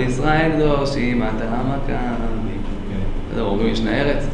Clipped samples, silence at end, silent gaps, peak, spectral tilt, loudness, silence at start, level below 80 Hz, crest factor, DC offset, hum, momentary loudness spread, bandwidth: under 0.1%; 0 s; none; -4 dBFS; -7 dB/octave; -21 LUFS; 0 s; -24 dBFS; 16 dB; under 0.1%; none; 10 LU; 9.4 kHz